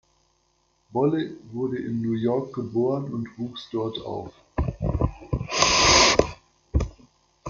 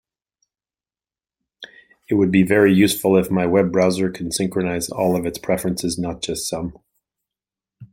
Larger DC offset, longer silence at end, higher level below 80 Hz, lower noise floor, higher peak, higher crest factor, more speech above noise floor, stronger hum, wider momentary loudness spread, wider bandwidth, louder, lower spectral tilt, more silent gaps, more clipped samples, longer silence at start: neither; about the same, 0 s vs 0.05 s; first, -38 dBFS vs -52 dBFS; second, -68 dBFS vs under -90 dBFS; about the same, 0 dBFS vs -2 dBFS; first, 24 dB vs 18 dB; second, 41 dB vs over 72 dB; neither; first, 17 LU vs 10 LU; second, 10 kHz vs 16.5 kHz; second, -24 LUFS vs -19 LUFS; second, -3.5 dB/octave vs -5.5 dB/octave; neither; neither; second, 0.9 s vs 1.6 s